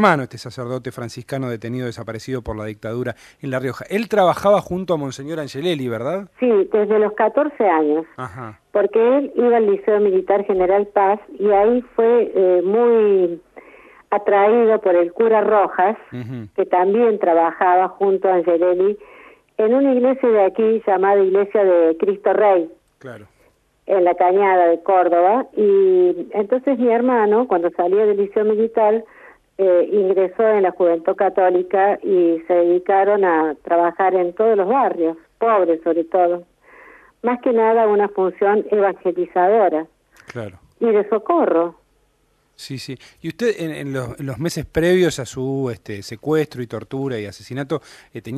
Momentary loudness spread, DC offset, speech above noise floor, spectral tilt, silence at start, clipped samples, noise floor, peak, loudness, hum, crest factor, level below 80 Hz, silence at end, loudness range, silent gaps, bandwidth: 14 LU; under 0.1%; 45 dB; -6.5 dB/octave; 0 s; under 0.1%; -62 dBFS; 0 dBFS; -17 LUFS; none; 18 dB; -54 dBFS; 0 s; 6 LU; none; 13.5 kHz